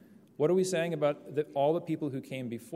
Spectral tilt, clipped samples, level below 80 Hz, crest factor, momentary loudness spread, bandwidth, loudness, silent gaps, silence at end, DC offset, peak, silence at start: -6 dB/octave; under 0.1%; -80 dBFS; 16 dB; 10 LU; 15.5 kHz; -31 LUFS; none; 0 s; under 0.1%; -16 dBFS; 0.4 s